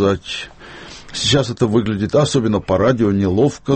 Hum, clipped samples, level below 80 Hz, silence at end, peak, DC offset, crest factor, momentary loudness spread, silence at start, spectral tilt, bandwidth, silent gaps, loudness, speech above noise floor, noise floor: none; under 0.1%; -42 dBFS; 0 s; -2 dBFS; under 0.1%; 14 dB; 17 LU; 0 s; -5.5 dB/octave; 8.8 kHz; none; -17 LUFS; 20 dB; -36 dBFS